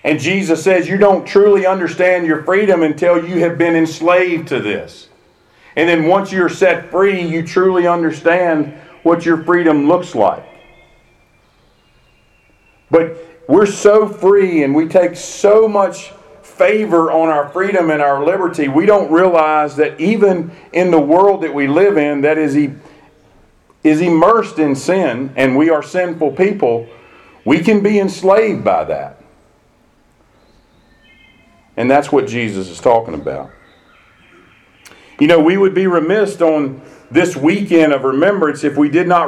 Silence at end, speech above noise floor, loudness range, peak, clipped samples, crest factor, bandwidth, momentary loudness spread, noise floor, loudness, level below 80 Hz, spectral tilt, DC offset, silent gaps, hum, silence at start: 0 s; 40 dB; 6 LU; 0 dBFS; under 0.1%; 14 dB; 12 kHz; 8 LU; -52 dBFS; -13 LUFS; -54 dBFS; -6 dB/octave; under 0.1%; none; none; 0.05 s